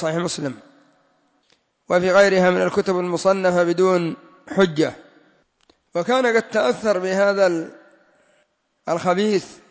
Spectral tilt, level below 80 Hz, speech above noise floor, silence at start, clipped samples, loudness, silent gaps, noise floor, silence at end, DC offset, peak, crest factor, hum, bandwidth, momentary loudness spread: -5.5 dB/octave; -64 dBFS; 46 dB; 0 s; under 0.1%; -19 LUFS; none; -65 dBFS; 0.15 s; under 0.1%; -6 dBFS; 16 dB; none; 8 kHz; 12 LU